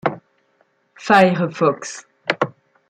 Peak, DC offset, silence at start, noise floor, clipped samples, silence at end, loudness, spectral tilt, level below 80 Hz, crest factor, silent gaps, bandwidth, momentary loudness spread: -2 dBFS; under 0.1%; 0.05 s; -62 dBFS; under 0.1%; 0.4 s; -18 LUFS; -5.5 dB/octave; -64 dBFS; 20 dB; none; 12.5 kHz; 19 LU